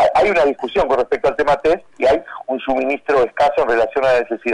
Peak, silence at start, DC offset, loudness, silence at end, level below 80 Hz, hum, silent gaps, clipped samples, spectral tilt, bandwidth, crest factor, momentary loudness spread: -8 dBFS; 0 s; under 0.1%; -17 LUFS; 0 s; -44 dBFS; none; none; under 0.1%; -5 dB/octave; 10.5 kHz; 8 dB; 5 LU